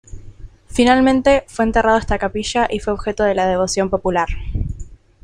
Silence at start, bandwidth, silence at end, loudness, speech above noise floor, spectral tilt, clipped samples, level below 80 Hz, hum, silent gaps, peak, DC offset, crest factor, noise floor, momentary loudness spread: 0.1 s; 11.5 kHz; 0.3 s; -17 LUFS; 21 dB; -5 dB/octave; under 0.1%; -30 dBFS; none; none; 0 dBFS; under 0.1%; 16 dB; -37 dBFS; 12 LU